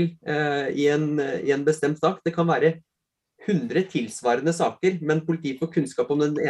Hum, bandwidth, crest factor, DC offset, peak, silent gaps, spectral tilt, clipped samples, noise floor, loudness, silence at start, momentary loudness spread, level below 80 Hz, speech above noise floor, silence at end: none; 12 kHz; 16 dB; under 0.1%; -8 dBFS; none; -6 dB/octave; under 0.1%; -61 dBFS; -24 LUFS; 0 s; 4 LU; -68 dBFS; 38 dB; 0 s